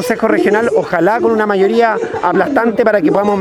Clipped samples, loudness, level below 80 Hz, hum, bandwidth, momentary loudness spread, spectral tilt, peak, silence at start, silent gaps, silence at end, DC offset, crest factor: under 0.1%; -12 LUFS; -52 dBFS; none; 17 kHz; 3 LU; -6 dB/octave; 0 dBFS; 0 s; none; 0 s; under 0.1%; 12 dB